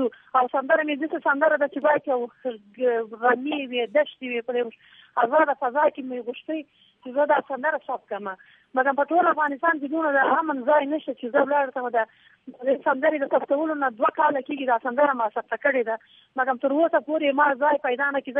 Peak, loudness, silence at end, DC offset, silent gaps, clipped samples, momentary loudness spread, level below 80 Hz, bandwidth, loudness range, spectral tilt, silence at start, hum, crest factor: -6 dBFS; -24 LUFS; 0 s; under 0.1%; none; under 0.1%; 11 LU; -84 dBFS; 3.8 kHz; 3 LU; -7.5 dB/octave; 0 s; none; 18 dB